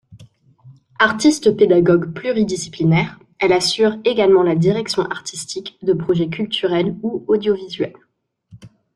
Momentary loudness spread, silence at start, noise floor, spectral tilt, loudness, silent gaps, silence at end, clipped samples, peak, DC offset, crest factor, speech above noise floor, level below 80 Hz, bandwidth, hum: 12 LU; 0.1 s; -52 dBFS; -5.5 dB/octave; -17 LUFS; none; 0.3 s; under 0.1%; 0 dBFS; under 0.1%; 18 dB; 35 dB; -54 dBFS; 12 kHz; none